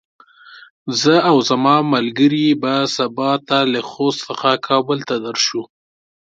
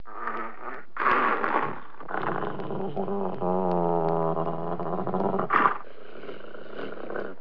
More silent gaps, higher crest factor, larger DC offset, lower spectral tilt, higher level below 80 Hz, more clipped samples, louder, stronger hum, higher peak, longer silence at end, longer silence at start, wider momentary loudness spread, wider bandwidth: first, 0.70-0.86 s vs none; second, 18 dB vs 24 dB; second, under 0.1% vs 2%; second, -4.5 dB/octave vs -9 dB/octave; about the same, -66 dBFS vs -64 dBFS; neither; first, -16 LUFS vs -28 LUFS; neither; first, 0 dBFS vs -4 dBFS; first, 0.7 s vs 0.05 s; first, 0.5 s vs 0.05 s; second, 7 LU vs 18 LU; first, 7.8 kHz vs 5.4 kHz